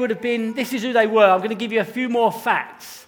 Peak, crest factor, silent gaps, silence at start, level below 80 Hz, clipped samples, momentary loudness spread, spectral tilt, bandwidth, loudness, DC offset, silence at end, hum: 0 dBFS; 20 dB; none; 0 s; -70 dBFS; under 0.1%; 9 LU; -4.5 dB/octave; over 20 kHz; -20 LUFS; under 0.1%; 0.05 s; none